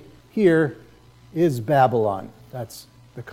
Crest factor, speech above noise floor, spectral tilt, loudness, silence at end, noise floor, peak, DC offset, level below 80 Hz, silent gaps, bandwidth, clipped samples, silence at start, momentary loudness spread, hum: 18 dB; 29 dB; -7.5 dB/octave; -21 LUFS; 0 s; -49 dBFS; -6 dBFS; under 0.1%; -60 dBFS; none; 16 kHz; under 0.1%; 0.35 s; 21 LU; none